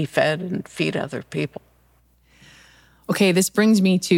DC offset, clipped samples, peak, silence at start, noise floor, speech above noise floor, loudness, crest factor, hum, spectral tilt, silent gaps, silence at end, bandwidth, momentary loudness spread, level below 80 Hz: under 0.1%; under 0.1%; -2 dBFS; 0 s; -59 dBFS; 39 dB; -21 LUFS; 20 dB; none; -5 dB/octave; none; 0 s; 16.5 kHz; 13 LU; -60 dBFS